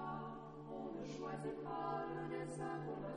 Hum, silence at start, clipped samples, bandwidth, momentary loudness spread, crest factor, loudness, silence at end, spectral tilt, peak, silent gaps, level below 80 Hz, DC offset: none; 0 s; under 0.1%; 10 kHz; 6 LU; 14 dB; -46 LUFS; 0 s; -6.5 dB/octave; -32 dBFS; none; -68 dBFS; under 0.1%